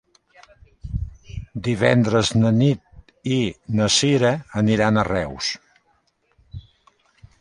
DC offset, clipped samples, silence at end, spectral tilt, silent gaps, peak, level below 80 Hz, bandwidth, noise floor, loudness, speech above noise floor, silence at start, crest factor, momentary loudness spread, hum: under 0.1%; under 0.1%; 0.8 s; -5 dB/octave; none; -2 dBFS; -42 dBFS; 11.5 kHz; -65 dBFS; -20 LUFS; 46 dB; 0.85 s; 20 dB; 19 LU; none